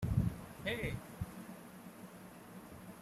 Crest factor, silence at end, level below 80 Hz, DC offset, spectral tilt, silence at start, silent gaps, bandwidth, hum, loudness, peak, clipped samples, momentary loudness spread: 22 dB; 0 s; -52 dBFS; under 0.1%; -6.5 dB/octave; 0 s; none; 15.5 kHz; none; -43 LUFS; -20 dBFS; under 0.1%; 16 LU